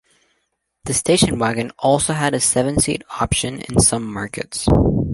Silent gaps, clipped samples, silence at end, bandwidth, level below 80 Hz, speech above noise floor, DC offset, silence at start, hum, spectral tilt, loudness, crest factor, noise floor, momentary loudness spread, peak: none; under 0.1%; 0 s; 12 kHz; -32 dBFS; 53 dB; under 0.1%; 0.85 s; none; -4 dB/octave; -18 LUFS; 18 dB; -71 dBFS; 9 LU; -2 dBFS